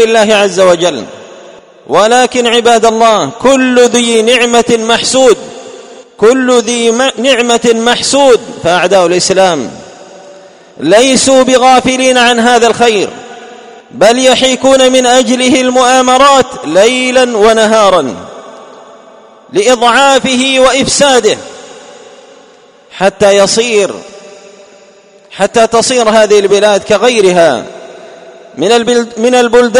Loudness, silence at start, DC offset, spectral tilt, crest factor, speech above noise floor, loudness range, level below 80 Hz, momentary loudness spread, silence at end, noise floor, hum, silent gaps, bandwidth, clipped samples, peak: -7 LUFS; 0 s; under 0.1%; -2.5 dB/octave; 8 dB; 33 dB; 4 LU; -44 dBFS; 8 LU; 0 s; -40 dBFS; none; none; 14 kHz; 2%; 0 dBFS